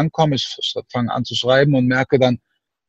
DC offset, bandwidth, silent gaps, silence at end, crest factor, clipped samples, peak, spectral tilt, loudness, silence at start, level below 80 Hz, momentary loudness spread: under 0.1%; 8 kHz; none; 0.5 s; 16 dB; under 0.1%; -2 dBFS; -6 dB/octave; -18 LUFS; 0 s; -54 dBFS; 8 LU